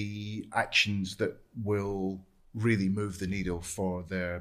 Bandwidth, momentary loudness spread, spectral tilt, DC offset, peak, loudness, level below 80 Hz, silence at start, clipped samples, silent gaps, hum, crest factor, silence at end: 14.5 kHz; 11 LU; -5 dB/octave; under 0.1%; -12 dBFS; -31 LUFS; -54 dBFS; 0 s; under 0.1%; none; none; 20 dB; 0 s